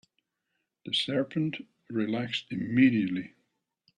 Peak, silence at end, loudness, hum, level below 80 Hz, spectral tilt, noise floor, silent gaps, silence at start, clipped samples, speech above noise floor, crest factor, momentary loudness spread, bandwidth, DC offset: -12 dBFS; 0.7 s; -29 LUFS; none; -72 dBFS; -6 dB/octave; -81 dBFS; none; 0.85 s; under 0.1%; 53 dB; 20 dB; 15 LU; 10.5 kHz; under 0.1%